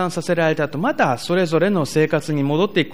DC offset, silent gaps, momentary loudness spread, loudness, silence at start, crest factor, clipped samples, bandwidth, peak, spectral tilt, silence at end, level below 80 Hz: 1%; none; 3 LU; -19 LUFS; 0 s; 14 dB; under 0.1%; 15.5 kHz; -4 dBFS; -6 dB/octave; 0 s; -56 dBFS